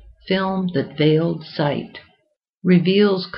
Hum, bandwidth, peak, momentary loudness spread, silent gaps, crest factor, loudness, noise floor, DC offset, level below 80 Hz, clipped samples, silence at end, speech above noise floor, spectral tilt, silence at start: none; 5.6 kHz; -4 dBFS; 9 LU; 2.49-2.61 s; 16 dB; -19 LUFS; -67 dBFS; under 0.1%; -56 dBFS; under 0.1%; 0 s; 49 dB; -10.5 dB/octave; 0.25 s